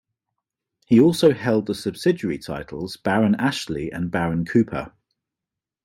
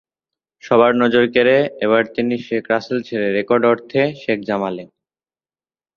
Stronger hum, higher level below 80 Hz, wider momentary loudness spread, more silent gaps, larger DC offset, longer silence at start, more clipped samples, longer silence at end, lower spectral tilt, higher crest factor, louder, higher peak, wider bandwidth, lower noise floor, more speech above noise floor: neither; first, -52 dBFS vs -60 dBFS; first, 14 LU vs 9 LU; neither; neither; first, 0.9 s vs 0.65 s; neither; second, 0.95 s vs 1.1 s; about the same, -6.5 dB/octave vs -7 dB/octave; about the same, 18 dB vs 18 dB; second, -21 LUFS vs -17 LUFS; second, -4 dBFS vs 0 dBFS; first, 16 kHz vs 6.8 kHz; about the same, -87 dBFS vs under -90 dBFS; second, 67 dB vs over 73 dB